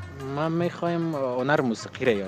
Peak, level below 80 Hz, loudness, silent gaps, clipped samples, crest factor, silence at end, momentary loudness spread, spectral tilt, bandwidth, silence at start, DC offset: -8 dBFS; -60 dBFS; -26 LUFS; none; under 0.1%; 18 dB; 0 s; 5 LU; -6.5 dB/octave; 13 kHz; 0 s; under 0.1%